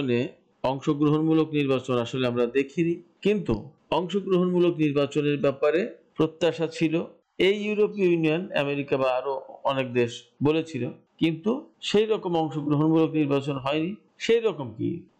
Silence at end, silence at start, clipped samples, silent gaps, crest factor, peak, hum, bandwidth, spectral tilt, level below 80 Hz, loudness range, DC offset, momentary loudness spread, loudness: 0.15 s; 0 s; under 0.1%; none; 12 dB; -14 dBFS; none; 8.8 kHz; -7 dB/octave; -56 dBFS; 2 LU; under 0.1%; 8 LU; -25 LUFS